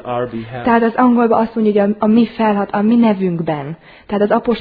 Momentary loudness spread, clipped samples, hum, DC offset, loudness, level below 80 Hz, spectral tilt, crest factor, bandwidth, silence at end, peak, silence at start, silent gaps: 10 LU; under 0.1%; none; under 0.1%; -15 LUFS; -50 dBFS; -10.5 dB/octave; 14 dB; 4.9 kHz; 0 s; 0 dBFS; 0.05 s; none